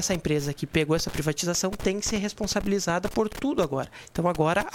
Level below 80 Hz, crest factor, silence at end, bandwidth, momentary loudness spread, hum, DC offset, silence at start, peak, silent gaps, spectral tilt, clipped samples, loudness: -44 dBFS; 18 dB; 0 s; 17 kHz; 4 LU; none; under 0.1%; 0 s; -8 dBFS; none; -4.5 dB/octave; under 0.1%; -27 LUFS